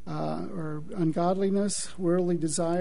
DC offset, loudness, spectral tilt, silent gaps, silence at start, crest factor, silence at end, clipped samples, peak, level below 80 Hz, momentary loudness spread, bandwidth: 2%; -28 LUFS; -5.5 dB/octave; none; 0.05 s; 14 dB; 0 s; under 0.1%; -14 dBFS; -56 dBFS; 9 LU; 11 kHz